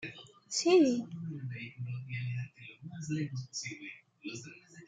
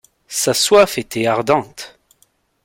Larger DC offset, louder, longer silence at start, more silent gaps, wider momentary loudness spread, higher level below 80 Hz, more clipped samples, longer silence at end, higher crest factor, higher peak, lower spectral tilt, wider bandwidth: neither; second, -34 LUFS vs -16 LUFS; second, 0 s vs 0.3 s; neither; about the same, 21 LU vs 21 LU; second, -76 dBFS vs -54 dBFS; neither; second, 0 s vs 0.75 s; about the same, 20 dB vs 18 dB; second, -14 dBFS vs 0 dBFS; first, -5 dB/octave vs -3 dB/octave; second, 9.4 kHz vs 17 kHz